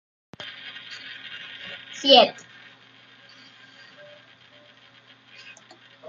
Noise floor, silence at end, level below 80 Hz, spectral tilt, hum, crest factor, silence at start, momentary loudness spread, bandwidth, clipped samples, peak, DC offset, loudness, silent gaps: -53 dBFS; 3.8 s; -80 dBFS; -2.5 dB/octave; none; 26 dB; 0.4 s; 30 LU; 7.6 kHz; under 0.1%; -2 dBFS; under 0.1%; -17 LUFS; none